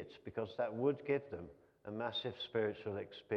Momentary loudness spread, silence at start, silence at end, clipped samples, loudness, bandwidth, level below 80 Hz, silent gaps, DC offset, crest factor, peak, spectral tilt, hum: 13 LU; 0 s; 0 s; under 0.1%; -40 LUFS; 6.2 kHz; -74 dBFS; none; under 0.1%; 18 dB; -22 dBFS; -7.5 dB/octave; none